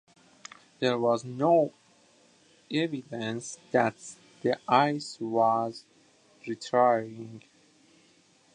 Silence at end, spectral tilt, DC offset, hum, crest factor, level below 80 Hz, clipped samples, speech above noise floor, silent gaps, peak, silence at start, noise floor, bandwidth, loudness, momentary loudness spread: 1.15 s; -5.5 dB/octave; under 0.1%; none; 22 dB; -78 dBFS; under 0.1%; 35 dB; none; -8 dBFS; 0.8 s; -63 dBFS; 10.5 kHz; -28 LUFS; 22 LU